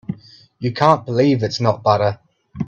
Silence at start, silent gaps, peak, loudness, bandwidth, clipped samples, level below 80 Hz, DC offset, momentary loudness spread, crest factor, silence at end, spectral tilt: 0.1 s; none; 0 dBFS; -17 LUFS; 7.8 kHz; under 0.1%; -54 dBFS; under 0.1%; 16 LU; 18 dB; 0 s; -7 dB/octave